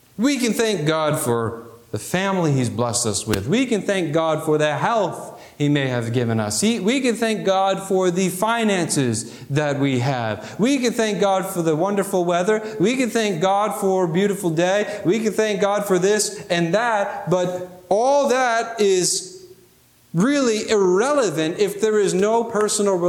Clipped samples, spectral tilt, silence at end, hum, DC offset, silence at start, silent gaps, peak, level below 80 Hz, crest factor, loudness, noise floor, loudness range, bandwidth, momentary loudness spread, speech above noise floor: under 0.1%; -4.5 dB/octave; 0 s; none; under 0.1%; 0.2 s; none; -6 dBFS; -58 dBFS; 14 dB; -20 LUFS; -54 dBFS; 1 LU; 19 kHz; 5 LU; 34 dB